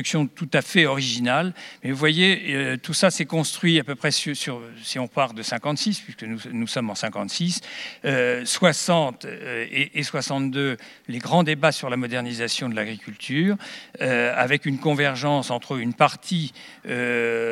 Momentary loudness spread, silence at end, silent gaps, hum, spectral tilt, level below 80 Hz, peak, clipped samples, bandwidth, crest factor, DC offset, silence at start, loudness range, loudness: 11 LU; 0 s; none; none; -4 dB/octave; -76 dBFS; -2 dBFS; under 0.1%; 15.5 kHz; 22 dB; under 0.1%; 0 s; 5 LU; -23 LUFS